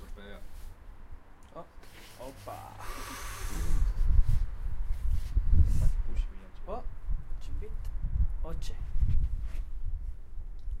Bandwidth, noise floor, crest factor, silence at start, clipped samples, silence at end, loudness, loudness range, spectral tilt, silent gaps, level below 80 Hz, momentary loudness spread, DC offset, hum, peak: 13 kHz; -48 dBFS; 18 dB; 0 s; under 0.1%; 0 s; -36 LUFS; 10 LU; -6 dB/octave; none; -30 dBFS; 20 LU; under 0.1%; none; -10 dBFS